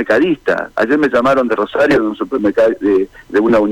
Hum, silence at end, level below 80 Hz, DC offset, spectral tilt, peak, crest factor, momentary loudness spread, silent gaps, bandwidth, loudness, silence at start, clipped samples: none; 0 s; -46 dBFS; under 0.1%; -6.5 dB/octave; -6 dBFS; 8 dB; 5 LU; none; 11.5 kHz; -14 LUFS; 0 s; under 0.1%